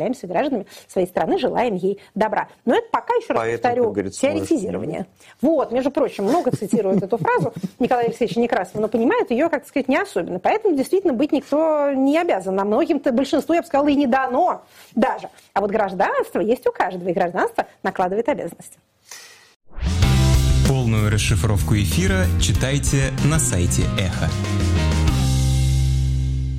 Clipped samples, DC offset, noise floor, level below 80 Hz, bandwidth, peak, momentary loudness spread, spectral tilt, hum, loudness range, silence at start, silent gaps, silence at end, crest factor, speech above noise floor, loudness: under 0.1%; under 0.1%; -43 dBFS; -30 dBFS; 16 kHz; -6 dBFS; 6 LU; -6 dB/octave; none; 3 LU; 0 s; 19.56-19.60 s; 0 s; 14 dB; 23 dB; -20 LUFS